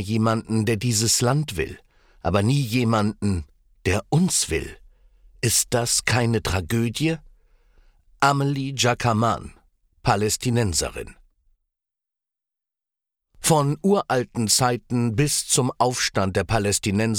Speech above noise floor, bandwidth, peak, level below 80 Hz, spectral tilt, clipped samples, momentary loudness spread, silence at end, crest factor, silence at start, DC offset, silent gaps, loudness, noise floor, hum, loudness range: 65 dB; 18.5 kHz; -4 dBFS; -46 dBFS; -4 dB/octave; under 0.1%; 8 LU; 0 s; 20 dB; 0 s; under 0.1%; none; -22 LUFS; -87 dBFS; none; 6 LU